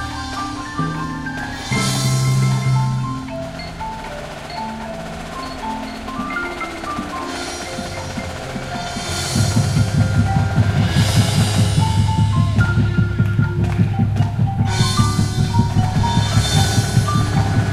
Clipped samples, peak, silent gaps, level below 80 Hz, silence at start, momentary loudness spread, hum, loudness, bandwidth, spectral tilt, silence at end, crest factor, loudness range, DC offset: under 0.1%; -2 dBFS; none; -32 dBFS; 0 s; 11 LU; none; -19 LUFS; 14 kHz; -5.5 dB/octave; 0 s; 16 dB; 9 LU; under 0.1%